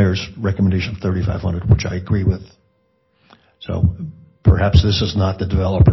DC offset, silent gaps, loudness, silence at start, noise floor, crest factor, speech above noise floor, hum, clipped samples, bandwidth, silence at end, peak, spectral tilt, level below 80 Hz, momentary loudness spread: under 0.1%; none; -18 LUFS; 0 s; -62 dBFS; 14 dB; 46 dB; none; under 0.1%; 6.2 kHz; 0 s; -2 dBFS; -7.5 dB/octave; -28 dBFS; 10 LU